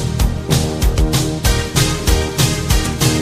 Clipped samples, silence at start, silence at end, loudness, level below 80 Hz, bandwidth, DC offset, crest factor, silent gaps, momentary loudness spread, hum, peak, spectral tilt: under 0.1%; 0 s; 0 s; -16 LUFS; -20 dBFS; 15.5 kHz; under 0.1%; 14 dB; none; 2 LU; none; 0 dBFS; -4.5 dB/octave